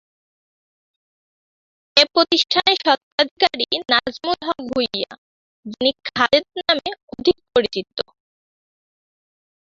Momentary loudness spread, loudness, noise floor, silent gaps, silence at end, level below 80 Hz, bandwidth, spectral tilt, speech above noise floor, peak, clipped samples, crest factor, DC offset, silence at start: 11 LU; -18 LUFS; under -90 dBFS; 3.03-3.18 s, 3.31-3.37 s, 5.18-5.63 s, 7.03-7.08 s; 1.65 s; -58 dBFS; 7.8 kHz; -3 dB/octave; over 70 dB; 0 dBFS; under 0.1%; 22 dB; under 0.1%; 1.95 s